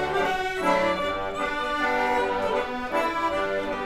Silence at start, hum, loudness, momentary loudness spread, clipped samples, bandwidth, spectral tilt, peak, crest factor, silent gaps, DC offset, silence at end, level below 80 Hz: 0 s; none; -25 LUFS; 4 LU; under 0.1%; 15.5 kHz; -4 dB/octave; -10 dBFS; 16 dB; none; under 0.1%; 0 s; -48 dBFS